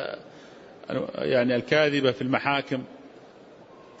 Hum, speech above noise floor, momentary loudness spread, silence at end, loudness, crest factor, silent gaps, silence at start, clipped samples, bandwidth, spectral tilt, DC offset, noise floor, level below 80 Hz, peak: none; 25 dB; 20 LU; 0.05 s; -25 LUFS; 20 dB; none; 0 s; under 0.1%; 8 kHz; -6 dB/octave; under 0.1%; -49 dBFS; -66 dBFS; -8 dBFS